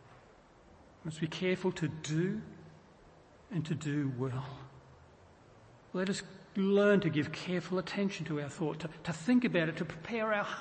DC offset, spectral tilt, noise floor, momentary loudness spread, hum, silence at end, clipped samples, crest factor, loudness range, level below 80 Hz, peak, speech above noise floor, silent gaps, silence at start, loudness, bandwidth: under 0.1%; -6 dB/octave; -60 dBFS; 14 LU; none; 0 s; under 0.1%; 18 dB; 7 LU; -68 dBFS; -16 dBFS; 27 dB; none; 0.1 s; -34 LUFS; 8.8 kHz